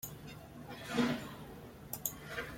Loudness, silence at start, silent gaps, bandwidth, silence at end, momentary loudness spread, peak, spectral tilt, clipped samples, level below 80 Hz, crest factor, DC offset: -40 LUFS; 0 s; none; 16.5 kHz; 0 s; 16 LU; -16 dBFS; -4 dB/octave; under 0.1%; -62 dBFS; 24 dB; under 0.1%